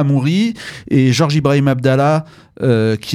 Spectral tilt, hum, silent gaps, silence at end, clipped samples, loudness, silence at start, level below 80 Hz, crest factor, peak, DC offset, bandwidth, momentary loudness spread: -6.5 dB/octave; none; none; 0 s; under 0.1%; -15 LUFS; 0 s; -50 dBFS; 14 dB; 0 dBFS; under 0.1%; 13 kHz; 7 LU